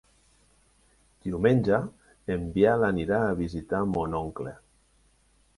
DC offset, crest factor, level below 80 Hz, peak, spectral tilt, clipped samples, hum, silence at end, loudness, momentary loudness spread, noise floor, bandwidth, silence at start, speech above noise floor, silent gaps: under 0.1%; 20 dB; -48 dBFS; -8 dBFS; -8.5 dB/octave; under 0.1%; none; 1.05 s; -27 LUFS; 16 LU; -64 dBFS; 11.5 kHz; 1.25 s; 39 dB; none